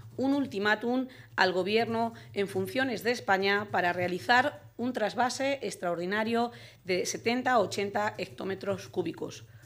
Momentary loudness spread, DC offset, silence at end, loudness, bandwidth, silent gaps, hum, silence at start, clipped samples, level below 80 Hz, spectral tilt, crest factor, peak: 9 LU; under 0.1%; 0.1 s; -30 LUFS; 16 kHz; none; none; 0.05 s; under 0.1%; -70 dBFS; -4 dB/octave; 22 dB; -8 dBFS